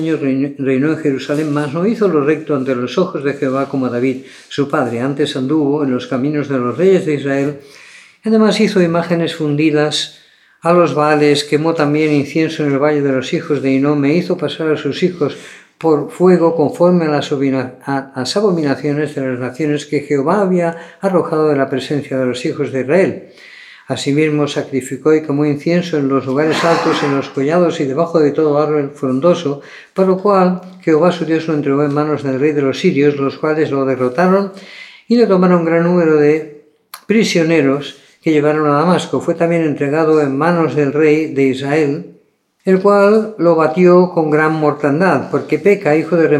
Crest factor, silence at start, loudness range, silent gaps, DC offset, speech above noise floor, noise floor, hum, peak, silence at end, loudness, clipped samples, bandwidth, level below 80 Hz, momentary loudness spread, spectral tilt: 14 dB; 0 s; 4 LU; none; under 0.1%; 40 dB; -54 dBFS; none; 0 dBFS; 0 s; -14 LUFS; under 0.1%; 12.5 kHz; -66 dBFS; 7 LU; -6.5 dB/octave